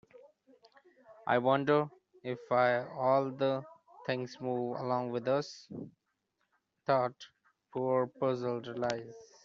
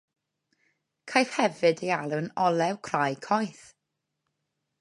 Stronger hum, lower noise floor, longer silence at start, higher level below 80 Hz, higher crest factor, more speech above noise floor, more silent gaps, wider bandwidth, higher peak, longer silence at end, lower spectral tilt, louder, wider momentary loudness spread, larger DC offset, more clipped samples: neither; about the same, -81 dBFS vs -83 dBFS; about the same, 1.1 s vs 1.05 s; about the same, -78 dBFS vs -76 dBFS; about the same, 22 dB vs 24 dB; second, 49 dB vs 56 dB; neither; second, 7.6 kHz vs 11.5 kHz; second, -12 dBFS vs -6 dBFS; second, 0.2 s vs 1.3 s; about the same, -5 dB/octave vs -5 dB/octave; second, -33 LUFS vs -27 LUFS; first, 15 LU vs 5 LU; neither; neither